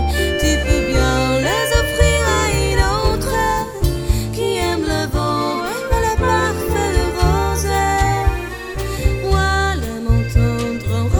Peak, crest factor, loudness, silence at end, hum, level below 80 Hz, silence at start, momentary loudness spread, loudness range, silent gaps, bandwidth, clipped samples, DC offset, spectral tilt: 0 dBFS; 16 dB; -18 LUFS; 0 s; none; -22 dBFS; 0 s; 5 LU; 3 LU; none; over 20 kHz; under 0.1%; under 0.1%; -5 dB/octave